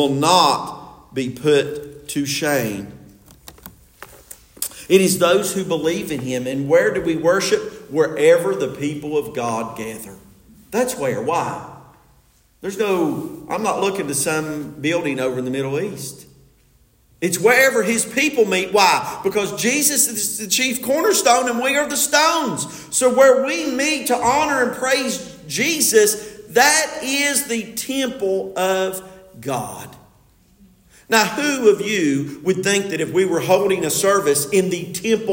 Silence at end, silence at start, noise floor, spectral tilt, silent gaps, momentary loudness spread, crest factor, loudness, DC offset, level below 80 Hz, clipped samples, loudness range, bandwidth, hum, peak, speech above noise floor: 0 s; 0 s; -56 dBFS; -3 dB/octave; none; 13 LU; 20 dB; -18 LUFS; under 0.1%; -56 dBFS; under 0.1%; 7 LU; 17 kHz; none; 0 dBFS; 37 dB